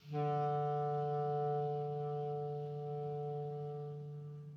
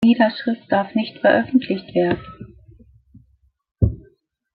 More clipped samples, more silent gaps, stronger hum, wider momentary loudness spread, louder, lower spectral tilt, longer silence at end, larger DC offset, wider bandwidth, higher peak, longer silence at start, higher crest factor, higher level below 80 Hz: neither; neither; neither; second, 9 LU vs 13 LU; second, -39 LUFS vs -20 LUFS; about the same, -10 dB/octave vs -9 dB/octave; second, 0 s vs 0.55 s; neither; first, 5.8 kHz vs 5 kHz; second, -26 dBFS vs -2 dBFS; about the same, 0.05 s vs 0 s; second, 12 dB vs 18 dB; second, -82 dBFS vs -38 dBFS